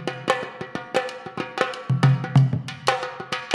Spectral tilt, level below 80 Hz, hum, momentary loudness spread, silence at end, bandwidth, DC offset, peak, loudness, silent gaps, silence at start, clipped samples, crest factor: -6 dB/octave; -60 dBFS; none; 13 LU; 0 s; 11.5 kHz; under 0.1%; 0 dBFS; -24 LUFS; none; 0 s; under 0.1%; 22 dB